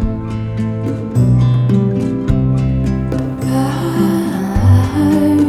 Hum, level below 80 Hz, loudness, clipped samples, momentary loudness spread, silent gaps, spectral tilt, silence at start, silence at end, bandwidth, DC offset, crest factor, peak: none; -26 dBFS; -15 LUFS; under 0.1%; 8 LU; none; -8.5 dB/octave; 0 s; 0 s; 14 kHz; under 0.1%; 12 dB; 0 dBFS